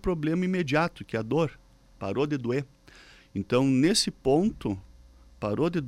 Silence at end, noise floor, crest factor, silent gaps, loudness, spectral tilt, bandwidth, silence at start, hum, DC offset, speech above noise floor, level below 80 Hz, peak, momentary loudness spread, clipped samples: 0 s; -53 dBFS; 16 dB; none; -27 LUFS; -5.5 dB/octave; 15.5 kHz; 0.05 s; none; under 0.1%; 27 dB; -50 dBFS; -12 dBFS; 13 LU; under 0.1%